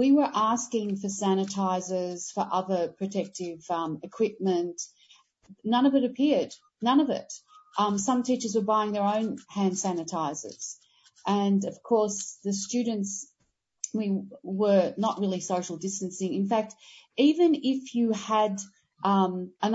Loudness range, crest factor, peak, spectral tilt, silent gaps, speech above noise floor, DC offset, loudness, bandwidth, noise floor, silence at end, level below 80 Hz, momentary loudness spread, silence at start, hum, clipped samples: 3 LU; 16 dB; -10 dBFS; -5 dB/octave; none; 48 dB; under 0.1%; -28 LUFS; 8 kHz; -75 dBFS; 0 s; -74 dBFS; 13 LU; 0 s; none; under 0.1%